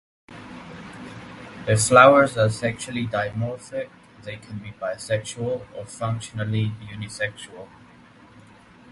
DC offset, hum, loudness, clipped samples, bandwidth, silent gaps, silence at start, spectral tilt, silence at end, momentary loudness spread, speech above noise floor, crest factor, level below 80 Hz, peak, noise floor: under 0.1%; none; -22 LUFS; under 0.1%; 11.5 kHz; none; 0.3 s; -5 dB/octave; 1.25 s; 24 LU; 27 dB; 24 dB; -54 dBFS; 0 dBFS; -50 dBFS